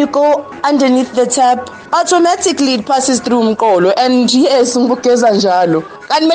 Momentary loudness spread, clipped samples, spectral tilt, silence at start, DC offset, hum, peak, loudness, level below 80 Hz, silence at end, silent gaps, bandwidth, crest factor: 5 LU; under 0.1%; -3.5 dB/octave; 0 s; under 0.1%; none; -2 dBFS; -12 LUFS; -56 dBFS; 0 s; none; 9.8 kHz; 8 dB